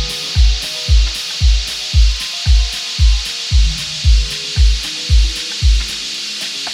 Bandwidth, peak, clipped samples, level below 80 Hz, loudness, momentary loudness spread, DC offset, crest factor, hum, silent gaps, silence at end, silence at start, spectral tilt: 13 kHz; -2 dBFS; under 0.1%; -14 dBFS; -16 LUFS; 4 LU; under 0.1%; 12 dB; none; none; 0 s; 0 s; -2.5 dB/octave